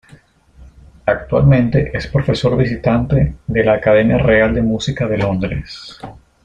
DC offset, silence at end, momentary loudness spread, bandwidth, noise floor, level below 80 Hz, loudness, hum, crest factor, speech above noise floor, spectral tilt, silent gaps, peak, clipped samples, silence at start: under 0.1%; 0.3 s; 13 LU; 8.4 kHz; -46 dBFS; -32 dBFS; -15 LUFS; none; 14 dB; 32 dB; -7.5 dB/octave; none; -2 dBFS; under 0.1%; 0.6 s